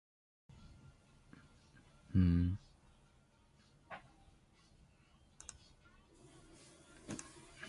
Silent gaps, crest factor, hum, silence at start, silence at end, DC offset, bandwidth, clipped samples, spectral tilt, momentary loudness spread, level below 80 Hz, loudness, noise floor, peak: none; 24 dB; none; 2.1 s; 0 s; under 0.1%; 11.5 kHz; under 0.1%; -7 dB/octave; 30 LU; -52 dBFS; -37 LUFS; -69 dBFS; -20 dBFS